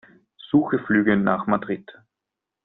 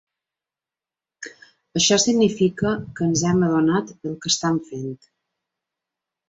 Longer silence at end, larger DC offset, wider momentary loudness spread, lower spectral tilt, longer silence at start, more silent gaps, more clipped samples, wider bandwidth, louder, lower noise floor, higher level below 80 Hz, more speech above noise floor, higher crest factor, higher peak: second, 0.75 s vs 1.35 s; neither; second, 9 LU vs 22 LU; first, -6 dB/octave vs -4 dB/octave; second, 0.45 s vs 1.2 s; neither; neither; second, 4 kHz vs 8.2 kHz; about the same, -22 LUFS vs -20 LUFS; second, -85 dBFS vs -90 dBFS; about the same, -60 dBFS vs -56 dBFS; second, 64 dB vs 69 dB; about the same, 18 dB vs 18 dB; about the same, -6 dBFS vs -4 dBFS